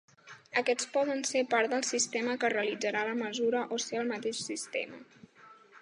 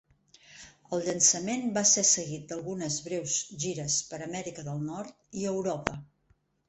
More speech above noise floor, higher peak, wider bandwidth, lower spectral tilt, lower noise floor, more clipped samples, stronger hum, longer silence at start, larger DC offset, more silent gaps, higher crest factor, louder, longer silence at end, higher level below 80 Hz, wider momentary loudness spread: second, 25 dB vs 39 dB; second, -12 dBFS vs -4 dBFS; first, 11.5 kHz vs 8.8 kHz; about the same, -2 dB/octave vs -2.5 dB/octave; second, -57 dBFS vs -69 dBFS; neither; neither; second, 0.25 s vs 0.5 s; neither; neither; second, 20 dB vs 28 dB; second, -31 LUFS vs -28 LUFS; second, 0.05 s vs 0.65 s; second, -86 dBFS vs -64 dBFS; second, 7 LU vs 15 LU